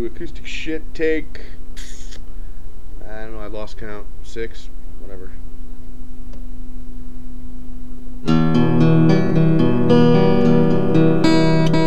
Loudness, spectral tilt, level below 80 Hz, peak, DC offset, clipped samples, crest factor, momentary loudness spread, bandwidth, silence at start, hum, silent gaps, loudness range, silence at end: -16 LUFS; -8 dB/octave; -30 dBFS; -2 dBFS; 10%; under 0.1%; 16 dB; 25 LU; 8.2 kHz; 0 s; none; none; 22 LU; 0 s